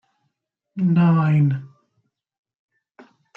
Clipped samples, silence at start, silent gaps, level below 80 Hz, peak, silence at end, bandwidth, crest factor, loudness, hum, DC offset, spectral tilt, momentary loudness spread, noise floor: under 0.1%; 0.75 s; none; -66 dBFS; -8 dBFS; 1.7 s; 4.2 kHz; 14 dB; -19 LUFS; none; under 0.1%; -10.5 dB/octave; 13 LU; -76 dBFS